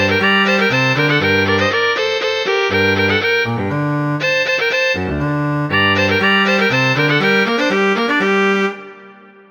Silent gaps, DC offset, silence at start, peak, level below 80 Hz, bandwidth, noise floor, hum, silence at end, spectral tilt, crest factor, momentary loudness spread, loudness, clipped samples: none; under 0.1%; 0 s; -2 dBFS; -46 dBFS; over 20 kHz; -41 dBFS; none; 0.4 s; -5 dB/octave; 14 dB; 6 LU; -14 LUFS; under 0.1%